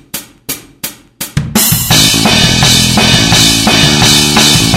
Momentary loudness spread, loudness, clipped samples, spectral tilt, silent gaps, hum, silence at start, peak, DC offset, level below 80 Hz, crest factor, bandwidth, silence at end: 17 LU; -6 LUFS; 1%; -2.5 dB/octave; none; none; 0.15 s; 0 dBFS; under 0.1%; -26 dBFS; 8 dB; over 20 kHz; 0 s